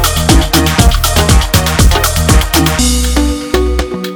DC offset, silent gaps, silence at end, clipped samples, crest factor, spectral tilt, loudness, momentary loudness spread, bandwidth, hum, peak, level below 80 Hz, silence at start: under 0.1%; none; 0 s; 0.4%; 10 dB; -4 dB/octave; -10 LUFS; 5 LU; over 20 kHz; none; 0 dBFS; -14 dBFS; 0 s